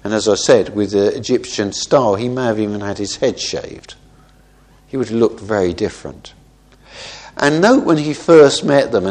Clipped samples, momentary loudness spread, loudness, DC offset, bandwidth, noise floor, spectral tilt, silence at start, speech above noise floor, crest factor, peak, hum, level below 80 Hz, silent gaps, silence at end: under 0.1%; 18 LU; -15 LUFS; under 0.1%; 10 kHz; -48 dBFS; -4.5 dB/octave; 0.05 s; 33 dB; 16 dB; 0 dBFS; none; -48 dBFS; none; 0 s